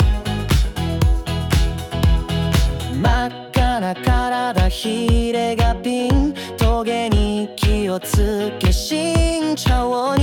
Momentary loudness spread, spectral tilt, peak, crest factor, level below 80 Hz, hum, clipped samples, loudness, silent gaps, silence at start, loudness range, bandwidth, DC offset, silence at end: 3 LU; -5.5 dB/octave; -6 dBFS; 12 dB; -22 dBFS; none; under 0.1%; -19 LUFS; none; 0 s; 1 LU; 18 kHz; under 0.1%; 0 s